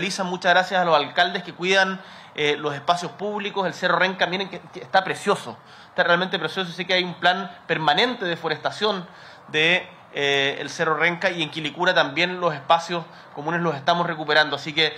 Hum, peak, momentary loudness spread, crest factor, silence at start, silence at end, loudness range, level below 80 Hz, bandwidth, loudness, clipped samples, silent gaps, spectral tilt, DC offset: none; -4 dBFS; 9 LU; 20 dB; 0 s; 0 s; 2 LU; -68 dBFS; 14 kHz; -22 LUFS; under 0.1%; none; -4 dB/octave; under 0.1%